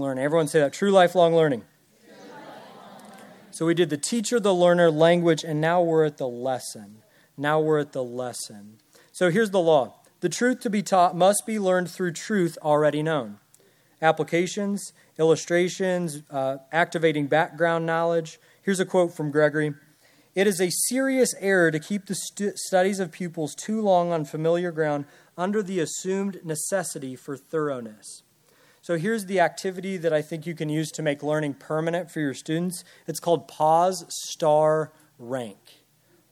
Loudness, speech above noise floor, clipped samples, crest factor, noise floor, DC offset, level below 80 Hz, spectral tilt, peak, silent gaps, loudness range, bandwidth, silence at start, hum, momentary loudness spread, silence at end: -24 LUFS; 38 dB; under 0.1%; 20 dB; -62 dBFS; under 0.1%; -78 dBFS; -5 dB/octave; -4 dBFS; none; 6 LU; 16 kHz; 0 s; none; 13 LU; 0.8 s